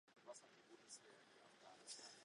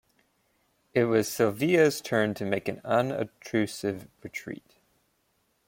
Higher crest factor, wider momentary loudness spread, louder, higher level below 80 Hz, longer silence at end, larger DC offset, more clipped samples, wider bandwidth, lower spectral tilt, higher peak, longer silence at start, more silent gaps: about the same, 22 dB vs 20 dB; second, 11 LU vs 16 LU; second, -62 LUFS vs -27 LUFS; second, under -90 dBFS vs -68 dBFS; second, 0 s vs 1.1 s; neither; neither; second, 11 kHz vs 16.5 kHz; second, -0.5 dB/octave vs -5.5 dB/octave; second, -42 dBFS vs -10 dBFS; second, 0.05 s vs 0.95 s; neither